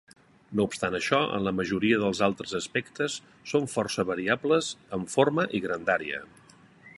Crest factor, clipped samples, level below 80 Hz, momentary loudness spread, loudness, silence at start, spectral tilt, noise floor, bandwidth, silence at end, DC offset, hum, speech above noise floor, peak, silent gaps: 22 dB; under 0.1%; -60 dBFS; 8 LU; -28 LUFS; 0.5 s; -4.5 dB/octave; -55 dBFS; 11.5 kHz; 0.05 s; under 0.1%; none; 28 dB; -6 dBFS; none